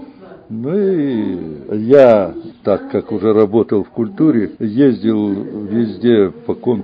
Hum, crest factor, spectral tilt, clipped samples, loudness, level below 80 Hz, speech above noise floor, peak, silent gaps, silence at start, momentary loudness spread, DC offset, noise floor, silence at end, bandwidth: none; 14 dB; -9.5 dB/octave; 0.3%; -15 LUFS; -50 dBFS; 23 dB; 0 dBFS; none; 0 s; 12 LU; under 0.1%; -37 dBFS; 0 s; 5.8 kHz